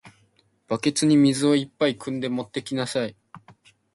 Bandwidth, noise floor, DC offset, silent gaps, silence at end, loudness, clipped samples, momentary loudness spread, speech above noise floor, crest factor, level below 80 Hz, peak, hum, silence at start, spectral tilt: 11.5 kHz; -64 dBFS; under 0.1%; none; 0.55 s; -23 LUFS; under 0.1%; 11 LU; 41 dB; 16 dB; -66 dBFS; -8 dBFS; none; 0.05 s; -5 dB/octave